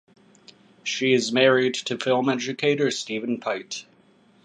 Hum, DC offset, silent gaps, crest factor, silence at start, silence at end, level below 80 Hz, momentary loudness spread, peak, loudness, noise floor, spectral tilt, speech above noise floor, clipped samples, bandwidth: none; under 0.1%; none; 20 dB; 0.85 s; 0.6 s; -76 dBFS; 12 LU; -4 dBFS; -23 LUFS; -58 dBFS; -4 dB/octave; 35 dB; under 0.1%; 10 kHz